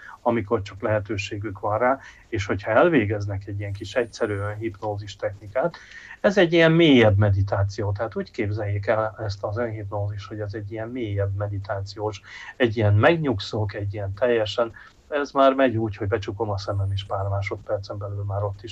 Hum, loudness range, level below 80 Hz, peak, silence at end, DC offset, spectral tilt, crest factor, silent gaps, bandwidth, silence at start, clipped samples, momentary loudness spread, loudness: none; 8 LU; -52 dBFS; -6 dBFS; 0 s; under 0.1%; -7 dB/octave; 18 dB; none; 7.8 kHz; 0 s; under 0.1%; 13 LU; -24 LUFS